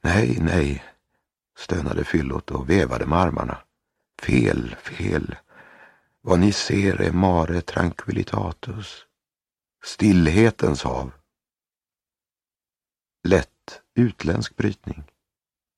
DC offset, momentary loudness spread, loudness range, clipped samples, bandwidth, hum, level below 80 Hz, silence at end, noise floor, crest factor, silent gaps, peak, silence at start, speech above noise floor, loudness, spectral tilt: under 0.1%; 17 LU; 4 LU; under 0.1%; 12 kHz; none; -38 dBFS; 0.75 s; under -90 dBFS; 22 dB; none; 0 dBFS; 0.05 s; over 69 dB; -22 LUFS; -6.5 dB/octave